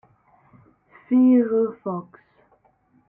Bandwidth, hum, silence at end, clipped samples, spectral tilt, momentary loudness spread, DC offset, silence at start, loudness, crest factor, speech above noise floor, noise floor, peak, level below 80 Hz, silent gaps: 3 kHz; none; 1.1 s; under 0.1%; -12.5 dB/octave; 15 LU; under 0.1%; 1.1 s; -20 LUFS; 14 dB; 42 dB; -62 dBFS; -8 dBFS; -72 dBFS; none